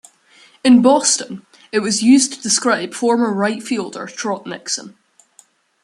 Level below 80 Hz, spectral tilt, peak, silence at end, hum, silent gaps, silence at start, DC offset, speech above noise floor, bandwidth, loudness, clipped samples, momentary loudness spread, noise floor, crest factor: -64 dBFS; -3 dB/octave; 0 dBFS; 0.95 s; none; none; 0.65 s; under 0.1%; 37 dB; 12 kHz; -16 LUFS; under 0.1%; 13 LU; -53 dBFS; 18 dB